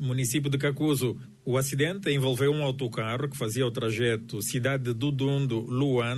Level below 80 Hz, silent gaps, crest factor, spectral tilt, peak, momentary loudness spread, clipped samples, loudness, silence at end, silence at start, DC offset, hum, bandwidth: -60 dBFS; none; 14 dB; -5.5 dB/octave; -14 dBFS; 5 LU; under 0.1%; -28 LUFS; 0 s; 0 s; under 0.1%; none; 12.5 kHz